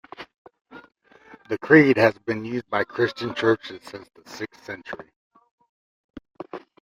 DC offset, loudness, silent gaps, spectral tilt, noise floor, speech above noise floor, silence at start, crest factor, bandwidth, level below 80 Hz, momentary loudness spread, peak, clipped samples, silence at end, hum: under 0.1%; -21 LUFS; 0.38-0.45 s, 5.16-5.31 s, 5.51-5.58 s, 5.69-6.14 s; -6.5 dB/octave; -51 dBFS; 28 dB; 0.2 s; 22 dB; 14.5 kHz; -64 dBFS; 26 LU; -2 dBFS; under 0.1%; 0.25 s; none